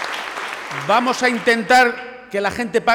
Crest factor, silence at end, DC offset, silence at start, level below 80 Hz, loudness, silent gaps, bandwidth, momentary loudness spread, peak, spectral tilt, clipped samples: 12 dB; 0 s; under 0.1%; 0 s; -54 dBFS; -18 LUFS; none; 19 kHz; 13 LU; -6 dBFS; -3 dB/octave; under 0.1%